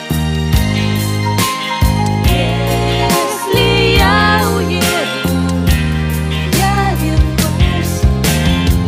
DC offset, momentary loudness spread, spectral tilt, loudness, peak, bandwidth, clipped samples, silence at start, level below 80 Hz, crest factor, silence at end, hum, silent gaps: under 0.1%; 5 LU; -5 dB/octave; -13 LUFS; 0 dBFS; 16 kHz; under 0.1%; 0 s; -20 dBFS; 12 dB; 0 s; none; none